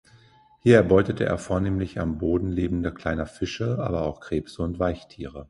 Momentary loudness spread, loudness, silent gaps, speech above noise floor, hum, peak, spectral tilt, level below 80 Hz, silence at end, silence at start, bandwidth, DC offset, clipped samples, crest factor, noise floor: 12 LU; -25 LUFS; none; 32 dB; none; -4 dBFS; -7.5 dB/octave; -40 dBFS; 0.05 s; 0.65 s; 11.5 kHz; under 0.1%; under 0.1%; 22 dB; -56 dBFS